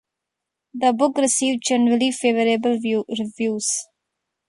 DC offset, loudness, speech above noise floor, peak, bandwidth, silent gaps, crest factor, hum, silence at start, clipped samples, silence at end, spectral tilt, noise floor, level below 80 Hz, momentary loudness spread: under 0.1%; -20 LUFS; 63 dB; -4 dBFS; 11.5 kHz; none; 16 dB; none; 0.75 s; under 0.1%; 0.65 s; -3 dB/octave; -83 dBFS; -70 dBFS; 6 LU